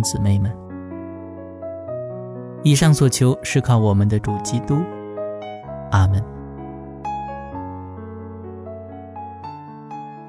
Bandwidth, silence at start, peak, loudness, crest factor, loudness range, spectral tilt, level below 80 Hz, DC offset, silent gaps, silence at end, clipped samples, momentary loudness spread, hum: 11 kHz; 0 s; -2 dBFS; -20 LUFS; 18 dB; 14 LU; -6 dB/octave; -44 dBFS; under 0.1%; none; 0 s; under 0.1%; 19 LU; none